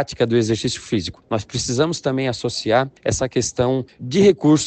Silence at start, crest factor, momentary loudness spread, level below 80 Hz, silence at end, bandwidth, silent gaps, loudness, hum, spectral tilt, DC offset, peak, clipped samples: 0 s; 16 dB; 9 LU; -46 dBFS; 0 s; 9.2 kHz; none; -20 LUFS; none; -5 dB/octave; under 0.1%; -2 dBFS; under 0.1%